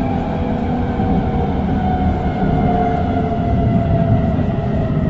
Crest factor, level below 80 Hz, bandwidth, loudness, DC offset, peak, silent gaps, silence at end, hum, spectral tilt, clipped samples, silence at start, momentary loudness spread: 12 dB; -26 dBFS; 7.2 kHz; -17 LUFS; under 0.1%; -4 dBFS; none; 0 s; none; -10 dB/octave; under 0.1%; 0 s; 4 LU